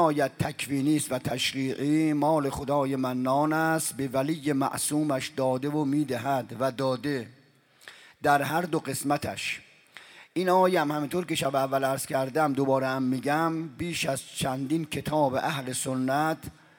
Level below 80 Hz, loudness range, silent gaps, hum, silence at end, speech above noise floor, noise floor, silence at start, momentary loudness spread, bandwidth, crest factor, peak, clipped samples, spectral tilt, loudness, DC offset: -60 dBFS; 3 LU; none; none; 0.25 s; 32 dB; -59 dBFS; 0 s; 6 LU; 18 kHz; 18 dB; -10 dBFS; under 0.1%; -5 dB/octave; -27 LUFS; under 0.1%